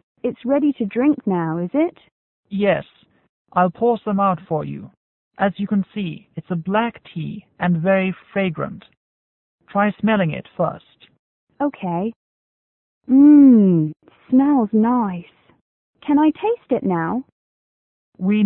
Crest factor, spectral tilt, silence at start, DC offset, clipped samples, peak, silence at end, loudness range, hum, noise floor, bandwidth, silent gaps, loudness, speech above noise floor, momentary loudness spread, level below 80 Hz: 16 dB; -12.5 dB/octave; 0.25 s; under 0.1%; under 0.1%; -4 dBFS; 0 s; 8 LU; none; under -90 dBFS; 4 kHz; 2.12-2.43 s, 3.29-3.45 s, 4.97-5.31 s, 8.97-9.58 s, 11.19-11.47 s, 12.16-13.01 s, 15.61-15.93 s, 17.32-18.12 s; -19 LUFS; over 72 dB; 13 LU; -60 dBFS